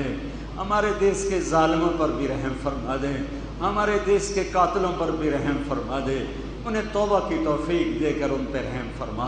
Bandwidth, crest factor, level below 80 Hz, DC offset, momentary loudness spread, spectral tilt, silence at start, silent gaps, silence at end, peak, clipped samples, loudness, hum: 10 kHz; 16 dB; -38 dBFS; under 0.1%; 9 LU; -5.5 dB/octave; 0 s; none; 0 s; -8 dBFS; under 0.1%; -25 LUFS; none